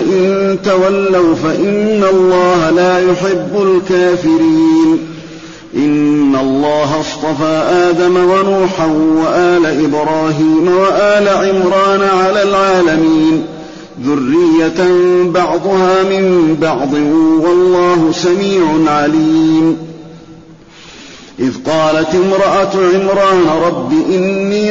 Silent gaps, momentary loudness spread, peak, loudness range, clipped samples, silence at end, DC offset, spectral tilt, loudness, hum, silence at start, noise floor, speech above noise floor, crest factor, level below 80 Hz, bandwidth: none; 6 LU; -2 dBFS; 3 LU; under 0.1%; 0 s; 0.5%; -5 dB/octave; -11 LUFS; none; 0 s; -37 dBFS; 26 dB; 8 dB; -46 dBFS; 7.8 kHz